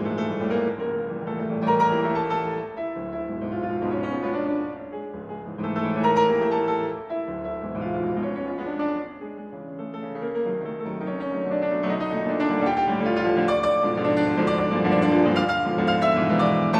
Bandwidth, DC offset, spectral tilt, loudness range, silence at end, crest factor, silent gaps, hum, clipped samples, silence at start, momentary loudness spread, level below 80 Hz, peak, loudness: 9.4 kHz; under 0.1%; -7.5 dB/octave; 8 LU; 0 s; 16 dB; none; none; under 0.1%; 0 s; 12 LU; -54 dBFS; -8 dBFS; -24 LUFS